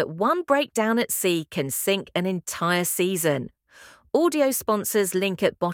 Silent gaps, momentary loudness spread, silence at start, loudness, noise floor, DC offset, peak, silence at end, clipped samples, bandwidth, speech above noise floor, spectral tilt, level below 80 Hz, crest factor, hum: none; 5 LU; 0 s; -23 LUFS; -51 dBFS; under 0.1%; -6 dBFS; 0 s; under 0.1%; 18.5 kHz; 28 dB; -4 dB/octave; -64 dBFS; 18 dB; none